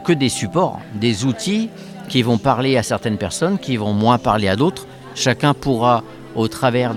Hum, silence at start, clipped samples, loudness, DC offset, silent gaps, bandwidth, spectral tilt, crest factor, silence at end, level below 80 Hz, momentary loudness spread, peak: none; 0 s; under 0.1%; -18 LUFS; under 0.1%; none; 15.5 kHz; -5.5 dB/octave; 18 dB; 0 s; -46 dBFS; 6 LU; 0 dBFS